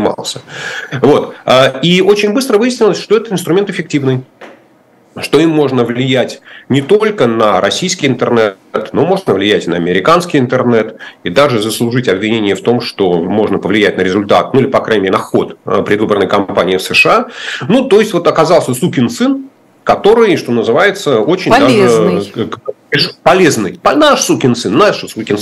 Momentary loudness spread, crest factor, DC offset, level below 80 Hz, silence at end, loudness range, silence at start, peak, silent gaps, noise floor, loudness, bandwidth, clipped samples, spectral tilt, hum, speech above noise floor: 8 LU; 10 dB; under 0.1%; -48 dBFS; 0 s; 3 LU; 0 s; 0 dBFS; none; -47 dBFS; -11 LUFS; 14 kHz; 0.2%; -5 dB/octave; none; 36 dB